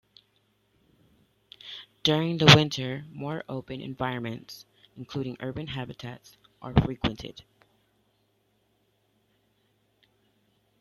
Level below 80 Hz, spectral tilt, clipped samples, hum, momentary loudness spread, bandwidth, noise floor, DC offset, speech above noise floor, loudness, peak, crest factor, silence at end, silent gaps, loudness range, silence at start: -50 dBFS; -5 dB/octave; under 0.1%; none; 26 LU; 13.5 kHz; -71 dBFS; under 0.1%; 44 dB; -26 LUFS; 0 dBFS; 30 dB; 3.4 s; none; 11 LU; 1.65 s